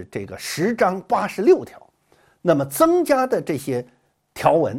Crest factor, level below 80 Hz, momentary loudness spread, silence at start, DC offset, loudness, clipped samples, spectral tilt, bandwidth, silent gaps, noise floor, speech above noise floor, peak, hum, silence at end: 18 dB; -58 dBFS; 12 LU; 0 s; under 0.1%; -20 LUFS; under 0.1%; -5.5 dB/octave; 16.5 kHz; none; -59 dBFS; 39 dB; -2 dBFS; none; 0 s